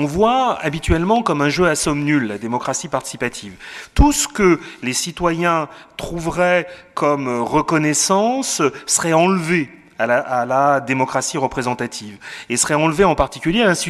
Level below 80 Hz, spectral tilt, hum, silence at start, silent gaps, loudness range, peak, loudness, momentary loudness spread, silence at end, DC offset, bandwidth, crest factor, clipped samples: -32 dBFS; -4 dB/octave; none; 0 s; none; 2 LU; 0 dBFS; -18 LUFS; 10 LU; 0 s; under 0.1%; 14.5 kHz; 18 dB; under 0.1%